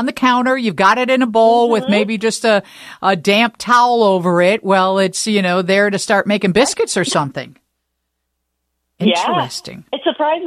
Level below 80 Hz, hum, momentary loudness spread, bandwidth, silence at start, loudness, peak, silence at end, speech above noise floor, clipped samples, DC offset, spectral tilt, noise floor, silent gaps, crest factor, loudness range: -56 dBFS; 60 Hz at -45 dBFS; 7 LU; 14.5 kHz; 0 s; -14 LUFS; -2 dBFS; 0 s; 58 dB; under 0.1%; under 0.1%; -4 dB/octave; -73 dBFS; none; 14 dB; 6 LU